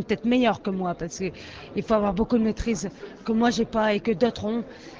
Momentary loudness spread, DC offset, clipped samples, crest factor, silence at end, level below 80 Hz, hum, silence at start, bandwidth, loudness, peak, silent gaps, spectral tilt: 11 LU; under 0.1%; under 0.1%; 16 dB; 0 s; -46 dBFS; none; 0 s; 8 kHz; -25 LUFS; -8 dBFS; none; -5.5 dB/octave